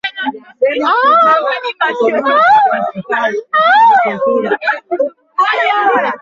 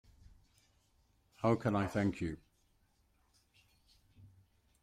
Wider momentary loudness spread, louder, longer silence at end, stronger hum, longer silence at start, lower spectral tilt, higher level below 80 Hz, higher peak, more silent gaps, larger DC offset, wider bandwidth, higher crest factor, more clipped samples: about the same, 10 LU vs 10 LU; first, -12 LUFS vs -35 LUFS; second, 0.05 s vs 0.55 s; neither; second, 0.05 s vs 1.4 s; second, -4.5 dB/octave vs -7.5 dB/octave; about the same, -62 dBFS vs -64 dBFS; first, -2 dBFS vs -18 dBFS; neither; neither; second, 7.4 kHz vs 14 kHz; second, 12 dB vs 22 dB; neither